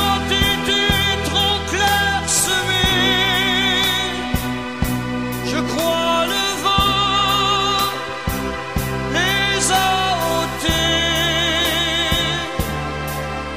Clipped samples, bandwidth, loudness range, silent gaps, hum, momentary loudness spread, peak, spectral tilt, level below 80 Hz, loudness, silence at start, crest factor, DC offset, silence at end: under 0.1%; 15.5 kHz; 3 LU; none; none; 8 LU; -2 dBFS; -3 dB/octave; -32 dBFS; -17 LUFS; 0 s; 16 dB; 0.6%; 0 s